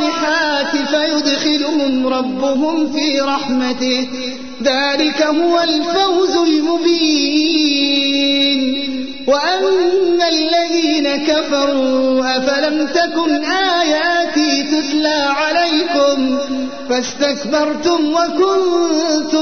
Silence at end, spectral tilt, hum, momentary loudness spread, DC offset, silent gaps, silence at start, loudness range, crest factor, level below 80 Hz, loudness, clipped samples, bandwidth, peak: 0 s; -2.5 dB/octave; none; 4 LU; 1%; none; 0 s; 2 LU; 12 dB; -52 dBFS; -15 LUFS; under 0.1%; 6.6 kHz; -4 dBFS